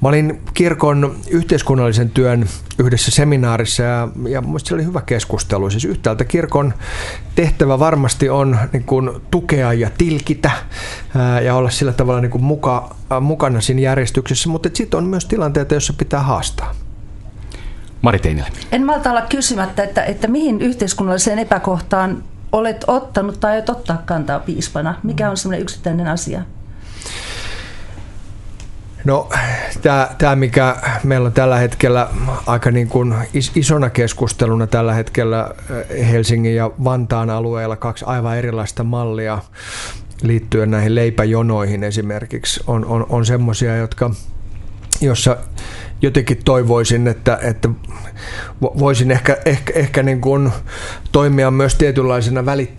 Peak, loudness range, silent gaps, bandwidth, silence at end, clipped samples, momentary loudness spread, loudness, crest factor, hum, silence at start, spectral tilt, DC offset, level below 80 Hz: 0 dBFS; 5 LU; none; 11.5 kHz; 0 s; under 0.1%; 13 LU; -16 LUFS; 16 dB; none; 0 s; -5.5 dB/octave; under 0.1%; -30 dBFS